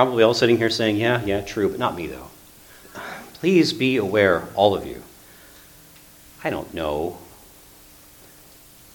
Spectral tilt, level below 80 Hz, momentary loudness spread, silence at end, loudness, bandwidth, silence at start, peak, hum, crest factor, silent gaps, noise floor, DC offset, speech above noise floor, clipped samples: -5.5 dB/octave; -50 dBFS; 18 LU; 1.7 s; -21 LUFS; 19 kHz; 0 s; 0 dBFS; none; 22 dB; none; -48 dBFS; under 0.1%; 28 dB; under 0.1%